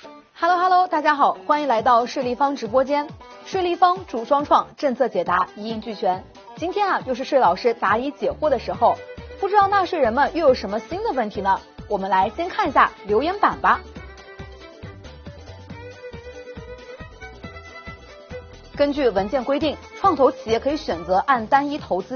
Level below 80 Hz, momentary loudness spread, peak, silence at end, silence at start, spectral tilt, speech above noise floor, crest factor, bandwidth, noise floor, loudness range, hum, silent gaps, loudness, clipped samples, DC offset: -48 dBFS; 21 LU; -2 dBFS; 0 s; 0.05 s; -3 dB/octave; 20 dB; 20 dB; 6.8 kHz; -40 dBFS; 18 LU; none; none; -21 LUFS; under 0.1%; under 0.1%